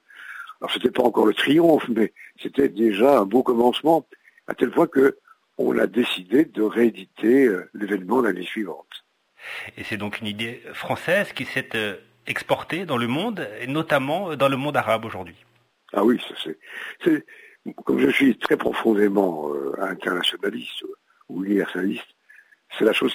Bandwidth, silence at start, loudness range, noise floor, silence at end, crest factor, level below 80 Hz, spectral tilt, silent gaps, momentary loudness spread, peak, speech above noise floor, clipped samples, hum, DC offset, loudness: 16 kHz; 0.15 s; 7 LU; -53 dBFS; 0 s; 18 dB; -64 dBFS; -5.5 dB/octave; none; 16 LU; -6 dBFS; 32 dB; under 0.1%; none; under 0.1%; -22 LUFS